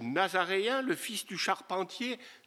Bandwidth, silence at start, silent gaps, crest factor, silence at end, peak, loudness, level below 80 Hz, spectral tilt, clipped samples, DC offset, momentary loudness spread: 16 kHz; 0 s; none; 20 dB; 0.1 s; -12 dBFS; -32 LUFS; under -90 dBFS; -3 dB/octave; under 0.1%; under 0.1%; 7 LU